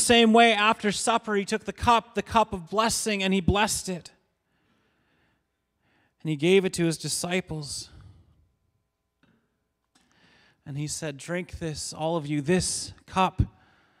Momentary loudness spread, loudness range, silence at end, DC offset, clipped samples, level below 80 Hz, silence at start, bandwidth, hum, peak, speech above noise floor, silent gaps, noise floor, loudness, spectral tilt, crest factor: 13 LU; 13 LU; 0.5 s; under 0.1%; under 0.1%; -46 dBFS; 0 s; 16 kHz; none; -6 dBFS; 52 dB; none; -77 dBFS; -25 LUFS; -4 dB/octave; 20 dB